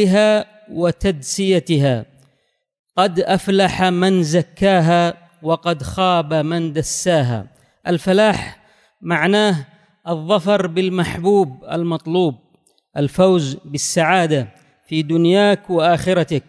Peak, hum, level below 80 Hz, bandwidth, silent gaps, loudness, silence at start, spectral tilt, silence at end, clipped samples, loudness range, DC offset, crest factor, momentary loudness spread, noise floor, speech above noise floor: -2 dBFS; none; -46 dBFS; 11 kHz; 2.79-2.84 s; -17 LUFS; 0 s; -5.5 dB/octave; 0.1 s; under 0.1%; 3 LU; under 0.1%; 16 dB; 10 LU; -65 dBFS; 49 dB